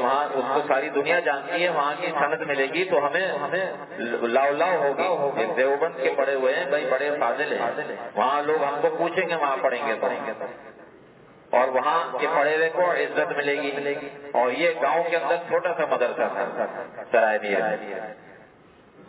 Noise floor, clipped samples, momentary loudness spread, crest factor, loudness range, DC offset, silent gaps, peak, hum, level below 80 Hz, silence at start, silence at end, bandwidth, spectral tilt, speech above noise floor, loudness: -52 dBFS; under 0.1%; 8 LU; 18 dB; 2 LU; under 0.1%; none; -6 dBFS; none; -76 dBFS; 0 s; 0.05 s; 4 kHz; -8 dB/octave; 29 dB; -24 LUFS